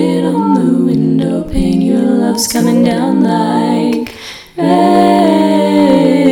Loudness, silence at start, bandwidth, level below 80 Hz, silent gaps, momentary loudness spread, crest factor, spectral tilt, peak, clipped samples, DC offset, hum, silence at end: -11 LUFS; 0 s; 17.5 kHz; -32 dBFS; none; 7 LU; 10 dB; -6 dB/octave; 0 dBFS; under 0.1%; under 0.1%; none; 0 s